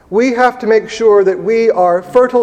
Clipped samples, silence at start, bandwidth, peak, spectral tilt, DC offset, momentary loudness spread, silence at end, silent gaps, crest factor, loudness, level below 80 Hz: 0.1%; 0.1 s; 9 kHz; 0 dBFS; -5.5 dB/octave; under 0.1%; 4 LU; 0 s; none; 12 dB; -12 LUFS; -52 dBFS